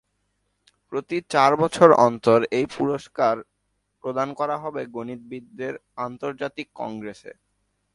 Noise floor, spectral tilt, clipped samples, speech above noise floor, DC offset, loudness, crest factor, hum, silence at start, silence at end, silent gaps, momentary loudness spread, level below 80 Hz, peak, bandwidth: -74 dBFS; -6 dB/octave; under 0.1%; 51 dB; under 0.1%; -22 LUFS; 24 dB; none; 0.9 s; 0.65 s; none; 18 LU; -64 dBFS; 0 dBFS; 11.5 kHz